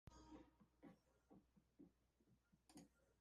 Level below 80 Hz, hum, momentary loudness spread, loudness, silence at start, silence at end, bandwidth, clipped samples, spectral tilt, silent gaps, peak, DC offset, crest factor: -80 dBFS; none; 4 LU; -68 LUFS; 0.05 s; 0 s; 11 kHz; under 0.1%; -5.5 dB/octave; none; -48 dBFS; under 0.1%; 22 dB